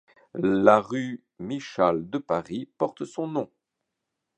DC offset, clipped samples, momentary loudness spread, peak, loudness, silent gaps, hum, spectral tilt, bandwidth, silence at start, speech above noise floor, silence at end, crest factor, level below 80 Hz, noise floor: under 0.1%; under 0.1%; 16 LU; -2 dBFS; -26 LUFS; none; none; -7 dB/octave; 9.2 kHz; 0.35 s; 58 dB; 0.95 s; 24 dB; -64 dBFS; -83 dBFS